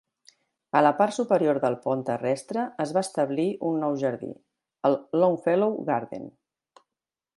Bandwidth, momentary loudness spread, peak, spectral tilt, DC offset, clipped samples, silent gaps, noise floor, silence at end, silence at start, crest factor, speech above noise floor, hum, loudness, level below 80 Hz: 11.5 kHz; 8 LU; -6 dBFS; -6.5 dB/octave; under 0.1%; under 0.1%; none; -89 dBFS; 1.1 s; 0.75 s; 20 dB; 65 dB; none; -25 LUFS; -74 dBFS